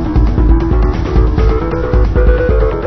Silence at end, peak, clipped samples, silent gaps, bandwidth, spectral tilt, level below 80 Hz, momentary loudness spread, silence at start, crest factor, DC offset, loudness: 0 s; 0 dBFS; under 0.1%; none; 5.8 kHz; -9.5 dB/octave; -12 dBFS; 2 LU; 0 s; 10 dB; under 0.1%; -13 LUFS